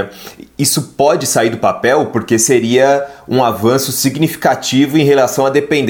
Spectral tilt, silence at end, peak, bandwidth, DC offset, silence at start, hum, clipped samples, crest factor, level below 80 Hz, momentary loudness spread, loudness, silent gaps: -4 dB/octave; 0 s; 0 dBFS; 19 kHz; under 0.1%; 0 s; none; under 0.1%; 12 dB; -52 dBFS; 5 LU; -13 LUFS; none